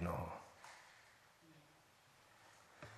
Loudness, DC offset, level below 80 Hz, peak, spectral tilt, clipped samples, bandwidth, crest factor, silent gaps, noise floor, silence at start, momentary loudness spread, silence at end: -53 LUFS; under 0.1%; -66 dBFS; -30 dBFS; -6 dB/octave; under 0.1%; 13 kHz; 24 dB; none; -69 dBFS; 0 s; 20 LU; 0 s